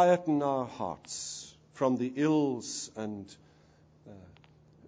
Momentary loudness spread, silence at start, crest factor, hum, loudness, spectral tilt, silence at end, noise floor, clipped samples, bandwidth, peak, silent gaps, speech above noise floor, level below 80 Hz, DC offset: 20 LU; 0 s; 20 dB; none; -31 LUFS; -5 dB/octave; 0.55 s; -61 dBFS; under 0.1%; 9.8 kHz; -12 dBFS; none; 31 dB; -70 dBFS; under 0.1%